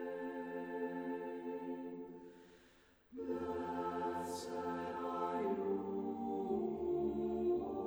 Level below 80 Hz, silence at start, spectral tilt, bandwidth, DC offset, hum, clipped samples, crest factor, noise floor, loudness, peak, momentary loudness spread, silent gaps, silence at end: -68 dBFS; 0 s; -6.5 dB/octave; over 20 kHz; under 0.1%; none; under 0.1%; 14 dB; -67 dBFS; -41 LUFS; -26 dBFS; 10 LU; none; 0 s